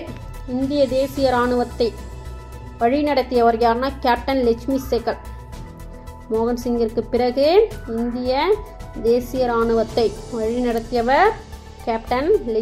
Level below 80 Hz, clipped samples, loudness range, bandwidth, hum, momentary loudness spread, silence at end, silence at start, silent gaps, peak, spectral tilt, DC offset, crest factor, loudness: -36 dBFS; under 0.1%; 2 LU; 15.5 kHz; none; 19 LU; 0 s; 0 s; none; -4 dBFS; -6 dB/octave; under 0.1%; 16 dB; -20 LUFS